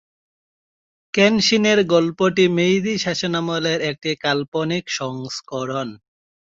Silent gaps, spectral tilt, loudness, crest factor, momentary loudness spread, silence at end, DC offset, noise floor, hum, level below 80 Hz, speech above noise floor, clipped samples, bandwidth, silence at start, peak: 4.48-4.52 s; -4.5 dB/octave; -19 LUFS; 18 dB; 12 LU; 0.55 s; under 0.1%; under -90 dBFS; none; -60 dBFS; over 71 dB; under 0.1%; 7.8 kHz; 1.15 s; -2 dBFS